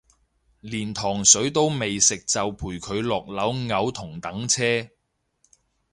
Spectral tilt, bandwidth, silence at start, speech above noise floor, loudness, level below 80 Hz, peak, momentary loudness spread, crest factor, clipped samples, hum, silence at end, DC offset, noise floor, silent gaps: -2.5 dB/octave; 11.5 kHz; 0.65 s; 44 dB; -22 LUFS; -52 dBFS; 0 dBFS; 15 LU; 26 dB; under 0.1%; none; 1.05 s; under 0.1%; -68 dBFS; none